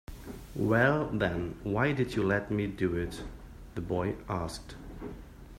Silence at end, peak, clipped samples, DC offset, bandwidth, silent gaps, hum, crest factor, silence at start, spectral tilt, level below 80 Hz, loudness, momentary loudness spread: 0 s; -10 dBFS; under 0.1%; under 0.1%; 16 kHz; none; none; 22 dB; 0.1 s; -7 dB/octave; -48 dBFS; -31 LUFS; 19 LU